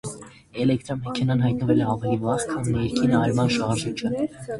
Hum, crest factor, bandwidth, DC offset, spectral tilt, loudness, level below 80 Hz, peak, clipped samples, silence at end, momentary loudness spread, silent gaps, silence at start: none; 16 dB; 11.5 kHz; under 0.1%; -6.5 dB/octave; -23 LUFS; -48 dBFS; -6 dBFS; under 0.1%; 0 s; 8 LU; none; 0.05 s